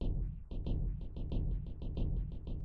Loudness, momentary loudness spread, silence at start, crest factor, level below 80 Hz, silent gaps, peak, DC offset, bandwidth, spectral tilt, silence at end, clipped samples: -41 LUFS; 5 LU; 0 s; 12 dB; -38 dBFS; none; -24 dBFS; under 0.1%; 4.5 kHz; -10.5 dB/octave; 0 s; under 0.1%